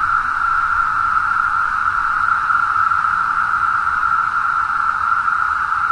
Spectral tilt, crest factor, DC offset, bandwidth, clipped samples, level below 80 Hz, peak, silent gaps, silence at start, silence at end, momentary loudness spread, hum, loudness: -2.5 dB/octave; 12 dB; under 0.1%; 11 kHz; under 0.1%; -44 dBFS; -4 dBFS; none; 0 s; 0 s; 2 LU; none; -16 LUFS